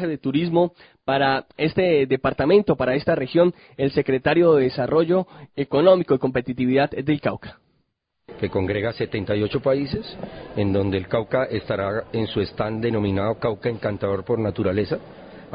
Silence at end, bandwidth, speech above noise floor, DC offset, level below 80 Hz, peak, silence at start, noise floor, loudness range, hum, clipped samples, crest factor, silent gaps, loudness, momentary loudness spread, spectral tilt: 0 s; 5.2 kHz; 50 dB; under 0.1%; -46 dBFS; -4 dBFS; 0 s; -72 dBFS; 5 LU; none; under 0.1%; 18 dB; none; -22 LUFS; 9 LU; -11.5 dB/octave